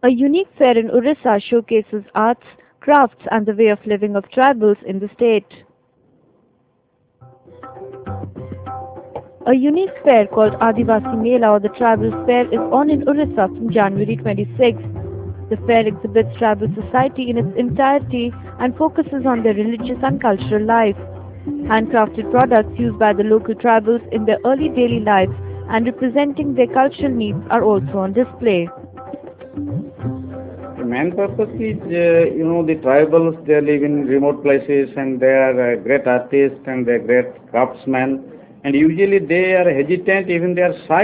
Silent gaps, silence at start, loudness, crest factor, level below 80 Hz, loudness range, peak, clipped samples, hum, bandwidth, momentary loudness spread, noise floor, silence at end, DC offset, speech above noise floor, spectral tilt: none; 0.05 s; -16 LUFS; 16 dB; -44 dBFS; 7 LU; 0 dBFS; under 0.1%; none; 4 kHz; 13 LU; -61 dBFS; 0 s; under 0.1%; 46 dB; -10.5 dB/octave